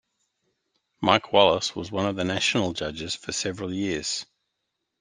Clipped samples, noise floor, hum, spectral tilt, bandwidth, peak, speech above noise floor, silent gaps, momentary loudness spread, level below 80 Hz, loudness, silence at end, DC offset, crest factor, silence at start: under 0.1%; -80 dBFS; none; -3.5 dB/octave; 10 kHz; -2 dBFS; 55 dB; none; 11 LU; -58 dBFS; -25 LUFS; 0.75 s; under 0.1%; 24 dB; 1 s